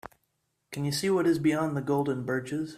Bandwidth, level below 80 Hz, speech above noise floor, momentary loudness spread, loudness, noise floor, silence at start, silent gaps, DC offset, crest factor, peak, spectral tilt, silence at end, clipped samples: 15 kHz; -66 dBFS; 50 dB; 7 LU; -28 LUFS; -77 dBFS; 0.05 s; none; under 0.1%; 14 dB; -14 dBFS; -6 dB/octave; 0 s; under 0.1%